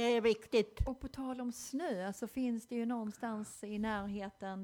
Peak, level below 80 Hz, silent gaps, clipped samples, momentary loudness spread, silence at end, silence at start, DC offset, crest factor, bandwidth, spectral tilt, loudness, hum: -20 dBFS; -52 dBFS; none; under 0.1%; 10 LU; 0 s; 0 s; under 0.1%; 16 dB; 18.5 kHz; -5 dB/octave; -38 LUFS; none